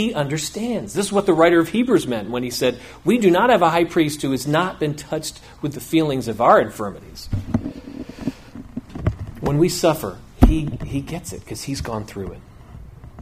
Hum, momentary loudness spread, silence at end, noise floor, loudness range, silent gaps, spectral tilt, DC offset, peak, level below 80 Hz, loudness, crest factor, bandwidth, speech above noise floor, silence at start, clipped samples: none; 17 LU; 0 s; -40 dBFS; 6 LU; none; -5.5 dB/octave; under 0.1%; 0 dBFS; -32 dBFS; -20 LUFS; 20 dB; 15.5 kHz; 20 dB; 0 s; under 0.1%